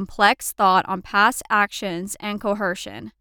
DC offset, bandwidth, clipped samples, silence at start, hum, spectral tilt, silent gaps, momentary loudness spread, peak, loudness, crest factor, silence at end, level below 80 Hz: under 0.1%; over 20 kHz; under 0.1%; 0 s; none; -3 dB/octave; none; 10 LU; -4 dBFS; -21 LUFS; 18 dB; 0.1 s; -52 dBFS